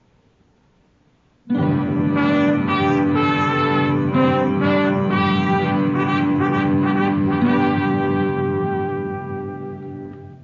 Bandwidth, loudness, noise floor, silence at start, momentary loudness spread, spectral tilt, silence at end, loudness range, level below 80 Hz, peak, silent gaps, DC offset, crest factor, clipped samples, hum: 7 kHz; -19 LUFS; -58 dBFS; 1.45 s; 11 LU; -8.5 dB/octave; 0.05 s; 3 LU; -56 dBFS; -6 dBFS; none; under 0.1%; 12 dB; under 0.1%; none